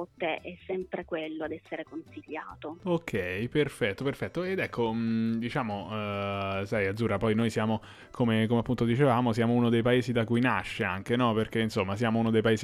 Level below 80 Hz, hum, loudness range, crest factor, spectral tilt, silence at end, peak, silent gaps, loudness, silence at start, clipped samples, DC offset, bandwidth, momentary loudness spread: -56 dBFS; none; 6 LU; 16 dB; -7 dB/octave; 0 s; -12 dBFS; none; -29 LUFS; 0 s; under 0.1%; under 0.1%; 13.5 kHz; 12 LU